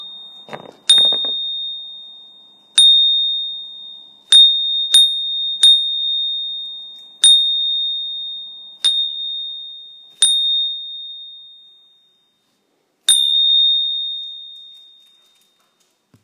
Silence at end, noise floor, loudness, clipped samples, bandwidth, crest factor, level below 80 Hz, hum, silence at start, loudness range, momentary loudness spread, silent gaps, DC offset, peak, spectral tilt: 1.55 s; -65 dBFS; -13 LUFS; under 0.1%; 12.5 kHz; 18 dB; -88 dBFS; none; 0 s; 7 LU; 23 LU; none; under 0.1%; 0 dBFS; 3 dB/octave